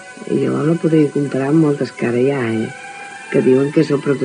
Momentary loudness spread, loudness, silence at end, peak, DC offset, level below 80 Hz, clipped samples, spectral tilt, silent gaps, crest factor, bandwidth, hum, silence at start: 9 LU; -16 LUFS; 0 s; -2 dBFS; under 0.1%; -66 dBFS; under 0.1%; -7.5 dB/octave; none; 14 dB; 10 kHz; none; 0 s